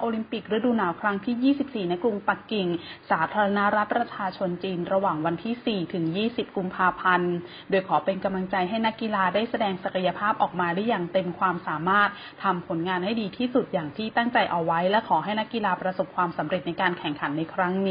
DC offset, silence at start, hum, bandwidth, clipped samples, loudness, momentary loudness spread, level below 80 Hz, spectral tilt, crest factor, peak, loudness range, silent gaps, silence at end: under 0.1%; 0 s; none; 5.2 kHz; under 0.1%; -26 LUFS; 6 LU; -62 dBFS; -10.5 dB/octave; 18 dB; -8 dBFS; 1 LU; none; 0 s